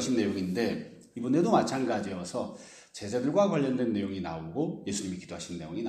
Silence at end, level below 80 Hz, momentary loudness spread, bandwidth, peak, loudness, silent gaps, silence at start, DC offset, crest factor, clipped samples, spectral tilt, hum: 0 s; -64 dBFS; 13 LU; 14 kHz; -12 dBFS; -30 LUFS; none; 0 s; under 0.1%; 18 dB; under 0.1%; -5.5 dB/octave; none